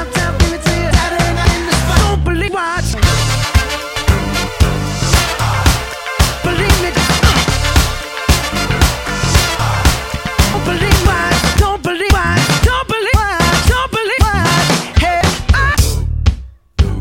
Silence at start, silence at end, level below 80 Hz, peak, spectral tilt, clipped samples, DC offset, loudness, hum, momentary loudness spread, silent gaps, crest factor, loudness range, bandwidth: 0 s; 0 s; -18 dBFS; 0 dBFS; -4 dB/octave; under 0.1%; under 0.1%; -13 LUFS; none; 5 LU; none; 12 dB; 2 LU; 17 kHz